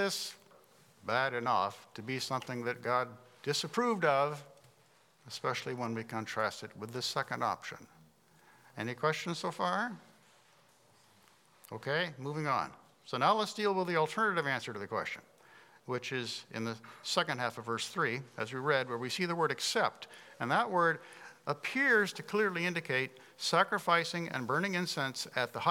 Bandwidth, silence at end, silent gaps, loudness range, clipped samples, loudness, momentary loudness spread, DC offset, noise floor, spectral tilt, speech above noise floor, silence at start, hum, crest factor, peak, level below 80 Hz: 17.5 kHz; 0 s; none; 7 LU; under 0.1%; -34 LUFS; 13 LU; under 0.1%; -66 dBFS; -4 dB/octave; 33 dB; 0 s; none; 22 dB; -12 dBFS; -86 dBFS